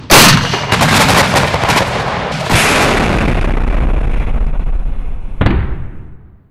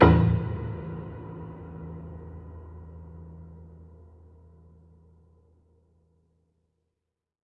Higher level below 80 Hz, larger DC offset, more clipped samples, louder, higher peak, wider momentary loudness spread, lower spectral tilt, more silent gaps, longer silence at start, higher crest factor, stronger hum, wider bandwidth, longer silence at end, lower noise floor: first, -18 dBFS vs -46 dBFS; neither; neither; first, -12 LUFS vs -29 LUFS; about the same, 0 dBFS vs -2 dBFS; second, 15 LU vs 24 LU; second, -3.5 dB/octave vs -10.5 dB/octave; neither; about the same, 0 s vs 0 s; second, 12 dB vs 28 dB; neither; first, 16.5 kHz vs 5.4 kHz; second, 0.35 s vs 3.7 s; second, -33 dBFS vs -85 dBFS